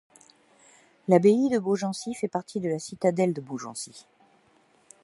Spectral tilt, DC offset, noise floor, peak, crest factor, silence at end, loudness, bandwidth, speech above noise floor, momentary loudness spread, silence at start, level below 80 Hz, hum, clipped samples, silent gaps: -6 dB/octave; under 0.1%; -63 dBFS; -6 dBFS; 22 dB; 1.05 s; -26 LUFS; 11.5 kHz; 37 dB; 16 LU; 1.1 s; -72 dBFS; none; under 0.1%; none